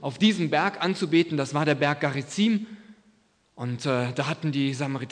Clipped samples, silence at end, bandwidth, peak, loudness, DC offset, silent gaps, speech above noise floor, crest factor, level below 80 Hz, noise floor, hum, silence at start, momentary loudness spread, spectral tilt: under 0.1%; 0 s; 10 kHz; -8 dBFS; -25 LUFS; under 0.1%; none; 38 dB; 18 dB; -72 dBFS; -63 dBFS; none; 0 s; 7 LU; -5.5 dB/octave